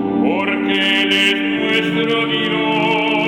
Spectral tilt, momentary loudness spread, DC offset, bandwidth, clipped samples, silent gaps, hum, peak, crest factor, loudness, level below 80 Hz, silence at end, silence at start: -4.5 dB/octave; 4 LU; under 0.1%; 13.5 kHz; under 0.1%; none; none; -2 dBFS; 14 dB; -15 LUFS; -54 dBFS; 0 s; 0 s